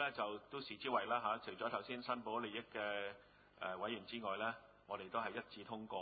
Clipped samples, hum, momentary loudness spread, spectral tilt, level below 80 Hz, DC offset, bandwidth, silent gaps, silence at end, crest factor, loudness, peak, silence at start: under 0.1%; none; 10 LU; -1.5 dB/octave; -78 dBFS; under 0.1%; 4.8 kHz; none; 0 s; 20 dB; -44 LUFS; -24 dBFS; 0 s